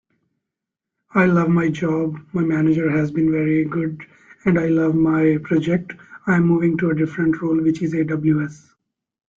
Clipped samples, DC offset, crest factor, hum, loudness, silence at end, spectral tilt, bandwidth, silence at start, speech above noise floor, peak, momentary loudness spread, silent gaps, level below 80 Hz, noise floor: under 0.1%; under 0.1%; 16 dB; none; -19 LUFS; 0.85 s; -9 dB/octave; 7.4 kHz; 1.15 s; 66 dB; -4 dBFS; 8 LU; none; -54 dBFS; -84 dBFS